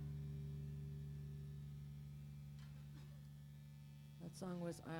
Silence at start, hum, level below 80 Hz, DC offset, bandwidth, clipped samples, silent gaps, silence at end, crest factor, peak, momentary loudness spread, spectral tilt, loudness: 0 s; none; -62 dBFS; under 0.1%; 18.5 kHz; under 0.1%; none; 0 s; 16 dB; -36 dBFS; 10 LU; -7 dB/octave; -53 LUFS